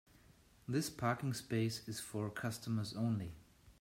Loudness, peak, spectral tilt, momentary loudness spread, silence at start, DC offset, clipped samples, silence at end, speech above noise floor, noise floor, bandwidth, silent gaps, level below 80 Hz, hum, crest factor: -40 LUFS; -22 dBFS; -5.5 dB/octave; 6 LU; 0.3 s; under 0.1%; under 0.1%; 0.1 s; 27 dB; -66 dBFS; 16 kHz; none; -68 dBFS; none; 18 dB